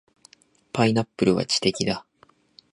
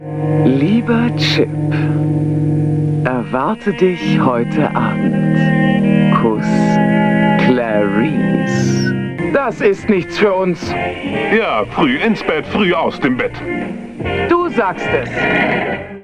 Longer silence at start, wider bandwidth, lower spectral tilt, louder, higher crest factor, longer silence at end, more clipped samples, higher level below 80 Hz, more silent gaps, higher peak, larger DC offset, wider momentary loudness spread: first, 0.75 s vs 0 s; about the same, 11 kHz vs 10 kHz; second, -4.5 dB/octave vs -7 dB/octave; second, -23 LUFS vs -15 LUFS; first, 20 dB vs 14 dB; first, 0.7 s vs 0 s; neither; second, -56 dBFS vs -42 dBFS; neither; about the same, -4 dBFS vs -2 dBFS; neither; first, 9 LU vs 6 LU